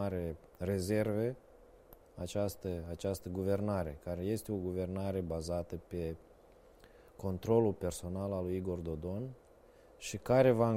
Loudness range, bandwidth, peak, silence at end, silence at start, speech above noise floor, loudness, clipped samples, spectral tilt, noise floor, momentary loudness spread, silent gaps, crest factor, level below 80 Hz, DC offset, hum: 2 LU; 16 kHz; -16 dBFS; 0 s; 0 s; 26 dB; -36 LUFS; under 0.1%; -7 dB/octave; -61 dBFS; 12 LU; none; 20 dB; -56 dBFS; under 0.1%; none